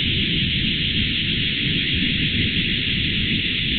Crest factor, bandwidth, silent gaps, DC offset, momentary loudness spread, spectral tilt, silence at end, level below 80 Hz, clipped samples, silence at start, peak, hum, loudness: 14 dB; 4.7 kHz; none; under 0.1%; 1 LU; -7.5 dB/octave; 0 s; -34 dBFS; under 0.1%; 0 s; -8 dBFS; none; -19 LUFS